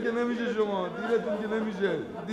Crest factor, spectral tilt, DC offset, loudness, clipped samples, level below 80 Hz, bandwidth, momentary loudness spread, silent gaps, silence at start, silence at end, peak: 14 dB; -6.5 dB/octave; under 0.1%; -30 LUFS; under 0.1%; -66 dBFS; 9.8 kHz; 3 LU; none; 0 s; 0 s; -14 dBFS